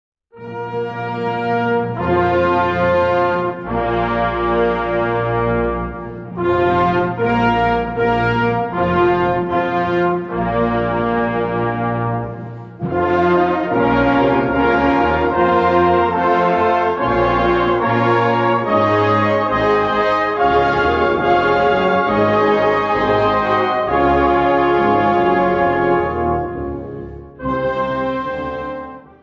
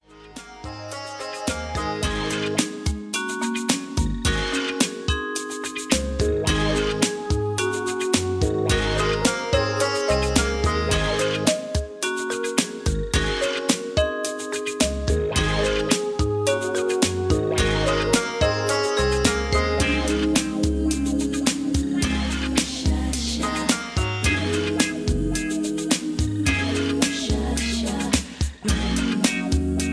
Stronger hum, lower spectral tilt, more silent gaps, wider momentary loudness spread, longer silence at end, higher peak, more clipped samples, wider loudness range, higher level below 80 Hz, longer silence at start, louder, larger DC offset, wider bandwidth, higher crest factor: neither; first, -8 dB/octave vs -4 dB/octave; neither; first, 9 LU vs 6 LU; first, 0.2 s vs 0 s; about the same, -2 dBFS vs -2 dBFS; neither; about the same, 4 LU vs 3 LU; second, -38 dBFS vs -32 dBFS; first, 0.35 s vs 0.1 s; first, -16 LUFS vs -23 LUFS; neither; second, 7 kHz vs 11 kHz; second, 14 dB vs 20 dB